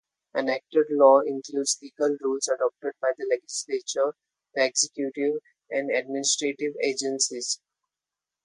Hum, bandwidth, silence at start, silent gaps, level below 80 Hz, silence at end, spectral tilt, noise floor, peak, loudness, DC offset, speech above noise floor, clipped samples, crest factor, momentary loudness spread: none; 11.5 kHz; 0.35 s; none; -82 dBFS; 0.9 s; -1.5 dB/octave; -89 dBFS; -4 dBFS; -26 LUFS; under 0.1%; 64 dB; under 0.1%; 22 dB; 9 LU